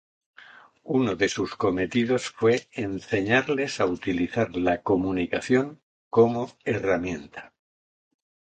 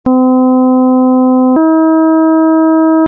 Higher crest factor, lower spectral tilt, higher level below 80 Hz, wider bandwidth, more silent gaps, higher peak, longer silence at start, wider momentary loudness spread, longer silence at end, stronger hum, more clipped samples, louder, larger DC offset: first, 20 dB vs 4 dB; second, -5.5 dB/octave vs -11.5 dB/octave; about the same, -54 dBFS vs -52 dBFS; first, 9.2 kHz vs 1.7 kHz; first, 5.83-6.11 s vs none; about the same, -6 dBFS vs -4 dBFS; first, 0.85 s vs 0.05 s; first, 8 LU vs 0 LU; first, 1.05 s vs 0 s; neither; neither; second, -25 LUFS vs -8 LUFS; neither